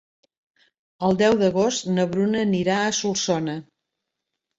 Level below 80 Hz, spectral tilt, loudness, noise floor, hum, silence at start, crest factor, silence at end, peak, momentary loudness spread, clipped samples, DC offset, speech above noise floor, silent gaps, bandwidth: -60 dBFS; -4.5 dB/octave; -22 LUFS; -82 dBFS; none; 1 s; 16 dB; 0.95 s; -6 dBFS; 7 LU; under 0.1%; under 0.1%; 61 dB; none; 8 kHz